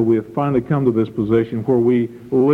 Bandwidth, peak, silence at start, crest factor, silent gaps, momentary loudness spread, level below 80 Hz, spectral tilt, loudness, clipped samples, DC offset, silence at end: 4.3 kHz; -4 dBFS; 0 s; 12 dB; none; 4 LU; -50 dBFS; -10 dB/octave; -18 LUFS; under 0.1%; under 0.1%; 0 s